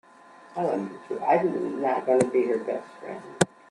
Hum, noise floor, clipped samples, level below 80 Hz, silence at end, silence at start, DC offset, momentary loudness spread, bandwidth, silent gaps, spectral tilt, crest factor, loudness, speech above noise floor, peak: none; -51 dBFS; under 0.1%; -70 dBFS; 0.25 s; 0.45 s; under 0.1%; 16 LU; 12 kHz; none; -5.5 dB/octave; 24 dB; -26 LUFS; 25 dB; -2 dBFS